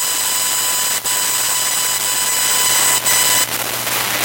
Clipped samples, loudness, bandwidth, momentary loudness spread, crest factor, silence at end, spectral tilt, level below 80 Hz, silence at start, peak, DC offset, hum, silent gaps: under 0.1%; -14 LUFS; 16.5 kHz; 5 LU; 14 dB; 0 s; 1 dB/octave; -56 dBFS; 0 s; -4 dBFS; under 0.1%; none; none